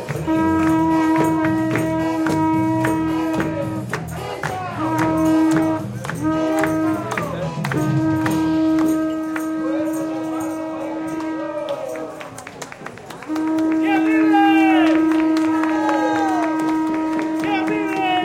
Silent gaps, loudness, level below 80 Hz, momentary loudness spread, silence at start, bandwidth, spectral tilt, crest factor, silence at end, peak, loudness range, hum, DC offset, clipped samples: none; -19 LUFS; -52 dBFS; 10 LU; 0 s; 15 kHz; -6.5 dB/octave; 16 dB; 0 s; -4 dBFS; 8 LU; none; under 0.1%; under 0.1%